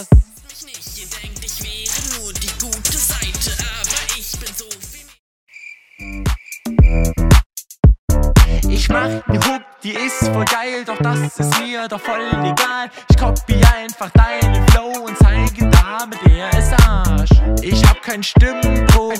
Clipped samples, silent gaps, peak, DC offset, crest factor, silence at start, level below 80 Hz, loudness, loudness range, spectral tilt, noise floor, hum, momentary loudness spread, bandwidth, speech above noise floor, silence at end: under 0.1%; 5.19-5.47 s, 7.46-7.50 s, 7.99-8.08 s; 0 dBFS; under 0.1%; 14 dB; 0 s; -18 dBFS; -16 LUFS; 7 LU; -5 dB/octave; -39 dBFS; none; 15 LU; 18 kHz; 25 dB; 0 s